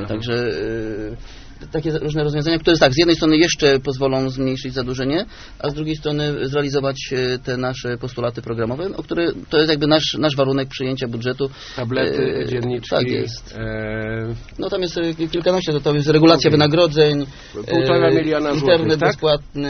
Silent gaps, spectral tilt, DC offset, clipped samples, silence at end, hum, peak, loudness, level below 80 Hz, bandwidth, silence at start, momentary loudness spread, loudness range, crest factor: none; -4.5 dB/octave; under 0.1%; under 0.1%; 0 s; none; 0 dBFS; -19 LUFS; -40 dBFS; 6.6 kHz; 0 s; 12 LU; 7 LU; 18 dB